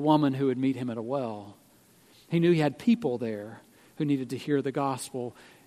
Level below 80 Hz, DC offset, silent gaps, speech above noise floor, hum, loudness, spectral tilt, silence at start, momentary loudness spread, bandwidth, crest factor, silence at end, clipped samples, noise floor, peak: -72 dBFS; under 0.1%; none; 32 dB; none; -28 LUFS; -7 dB/octave; 0 s; 13 LU; 14 kHz; 20 dB; 0.25 s; under 0.1%; -59 dBFS; -8 dBFS